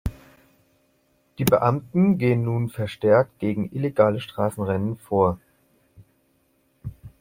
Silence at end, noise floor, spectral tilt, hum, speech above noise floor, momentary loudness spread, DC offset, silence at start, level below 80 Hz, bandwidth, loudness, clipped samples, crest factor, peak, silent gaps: 0.1 s; -66 dBFS; -7.5 dB/octave; none; 44 dB; 16 LU; under 0.1%; 0.05 s; -48 dBFS; 16.5 kHz; -22 LUFS; under 0.1%; 20 dB; -4 dBFS; none